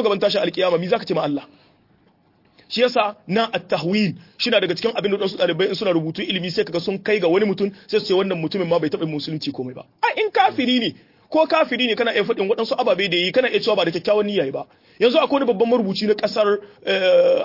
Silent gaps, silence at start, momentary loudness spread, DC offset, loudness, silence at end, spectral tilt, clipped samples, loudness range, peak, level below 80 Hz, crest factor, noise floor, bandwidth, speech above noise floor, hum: none; 0 s; 7 LU; under 0.1%; -20 LUFS; 0 s; -6 dB/octave; under 0.1%; 3 LU; -4 dBFS; -66 dBFS; 16 dB; -58 dBFS; 5.8 kHz; 39 dB; none